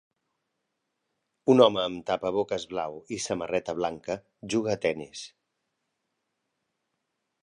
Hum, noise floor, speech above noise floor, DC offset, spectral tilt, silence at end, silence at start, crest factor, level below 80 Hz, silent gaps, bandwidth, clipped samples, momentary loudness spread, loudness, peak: none; -81 dBFS; 54 dB; under 0.1%; -4.5 dB/octave; 2.15 s; 1.45 s; 24 dB; -64 dBFS; none; 11 kHz; under 0.1%; 16 LU; -27 LUFS; -6 dBFS